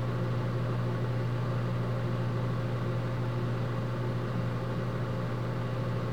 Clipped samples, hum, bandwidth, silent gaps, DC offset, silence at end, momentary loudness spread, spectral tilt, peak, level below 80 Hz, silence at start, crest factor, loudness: under 0.1%; none; 8 kHz; none; 0.6%; 0 s; 2 LU; -8 dB/octave; -20 dBFS; -50 dBFS; 0 s; 10 dB; -32 LUFS